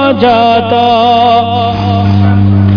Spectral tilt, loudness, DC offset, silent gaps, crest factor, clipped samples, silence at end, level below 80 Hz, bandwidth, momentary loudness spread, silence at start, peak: -8.5 dB/octave; -8 LUFS; under 0.1%; none; 8 dB; 0.3%; 0 s; -36 dBFS; 5.4 kHz; 4 LU; 0 s; 0 dBFS